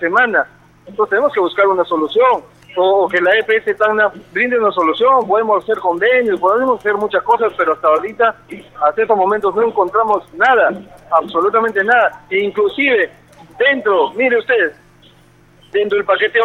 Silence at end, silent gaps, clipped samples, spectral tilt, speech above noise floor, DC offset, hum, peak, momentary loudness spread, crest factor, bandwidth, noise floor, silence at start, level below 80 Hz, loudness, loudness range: 0 s; none; under 0.1%; -5.5 dB/octave; 33 dB; under 0.1%; none; 0 dBFS; 5 LU; 14 dB; 10 kHz; -48 dBFS; 0 s; -56 dBFS; -14 LUFS; 2 LU